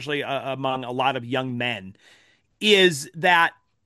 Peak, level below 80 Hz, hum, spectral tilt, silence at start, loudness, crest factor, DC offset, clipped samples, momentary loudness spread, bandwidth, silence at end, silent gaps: -4 dBFS; -72 dBFS; none; -4 dB/octave; 0 s; -22 LUFS; 20 dB; under 0.1%; under 0.1%; 11 LU; 12.5 kHz; 0.35 s; none